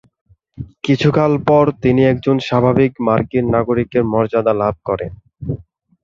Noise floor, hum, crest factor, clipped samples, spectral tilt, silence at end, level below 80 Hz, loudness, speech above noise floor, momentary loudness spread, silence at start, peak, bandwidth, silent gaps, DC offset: -34 dBFS; none; 14 dB; under 0.1%; -8 dB/octave; 0.4 s; -42 dBFS; -15 LUFS; 19 dB; 14 LU; 0.6 s; -2 dBFS; 7.4 kHz; none; under 0.1%